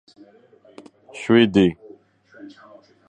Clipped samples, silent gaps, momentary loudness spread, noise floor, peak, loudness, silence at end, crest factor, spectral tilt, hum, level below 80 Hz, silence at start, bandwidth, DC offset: under 0.1%; none; 26 LU; -50 dBFS; -2 dBFS; -18 LUFS; 1.35 s; 20 dB; -6.5 dB/octave; none; -54 dBFS; 1.15 s; 9.4 kHz; under 0.1%